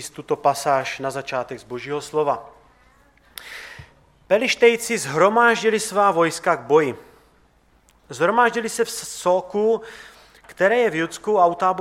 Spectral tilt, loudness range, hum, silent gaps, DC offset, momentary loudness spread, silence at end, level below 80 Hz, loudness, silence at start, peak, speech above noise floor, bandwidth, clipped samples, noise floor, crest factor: -3.5 dB/octave; 8 LU; none; none; under 0.1%; 19 LU; 0 s; -60 dBFS; -20 LUFS; 0 s; -2 dBFS; 38 dB; 16 kHz; under 0.1%; -58 dBFS; 20 dB